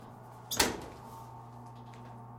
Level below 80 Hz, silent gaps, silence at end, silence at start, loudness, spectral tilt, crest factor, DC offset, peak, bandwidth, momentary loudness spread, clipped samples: -58 dBFS; none; 0 s; 0 s; -32 LUFS; -2 dB/octave; 32 dB; under 0.1%; -6 dBFS; 16.5 kHz; 20 LU; under 0.1%